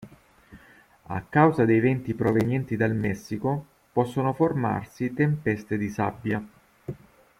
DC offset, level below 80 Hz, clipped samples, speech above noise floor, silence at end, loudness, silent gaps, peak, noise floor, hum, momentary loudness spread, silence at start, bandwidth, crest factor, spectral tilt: under 0.1%; -56 dBFS; under 0.1%; 30 dB; 0.45 s; -25 LUFS; none; -6 dBFS; -55 dBFS; none; 14 LU; 0 s; 15.5 kHz; 20 dB; -8.5 dB/octave